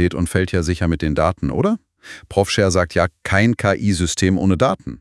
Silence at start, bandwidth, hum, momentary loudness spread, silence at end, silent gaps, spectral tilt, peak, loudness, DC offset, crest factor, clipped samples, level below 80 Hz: 0 s; 12 kHz; none; 4 LU; 0.05 s; none; -5.5 dB/octave; 0 dBFS; -18 LUFS; under 0.1%; 18 dB; under 0.1%; -38 dBFS